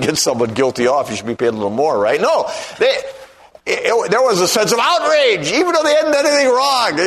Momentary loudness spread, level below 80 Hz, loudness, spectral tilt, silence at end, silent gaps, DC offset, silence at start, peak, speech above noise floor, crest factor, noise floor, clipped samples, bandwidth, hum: 6 LU; -56 dBFS; -15 LUFS; -3 dB/octave; 0 s; none; under 0.1%; 0 s; -2 dBFS; 26 dB; 14 dB; -40 dBFS; under 0.1%; 13.5 kHz; none